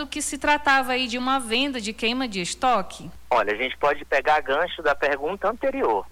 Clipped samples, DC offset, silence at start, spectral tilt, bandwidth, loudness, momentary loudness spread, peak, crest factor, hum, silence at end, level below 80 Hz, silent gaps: under 0.1%; under 0.1%; 0 s; -2.5 dB/octave; 19 kHz; -23 LUFS; 6 LU; -10 dBFS; 14 dB; none; 0 s; -50 dBFS; none